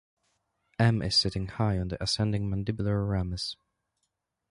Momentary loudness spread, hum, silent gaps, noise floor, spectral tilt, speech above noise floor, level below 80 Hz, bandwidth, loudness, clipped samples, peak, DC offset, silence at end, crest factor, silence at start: 10 LU; none; none; -81 dBFS; -5.5 dB/octave; 53 dB; -46 dBFS; 11.5 kHz; -28 LUFS; under 0.1%; -12 dBFS; under 0.1%; 1 s; 18 dB; 0.8 s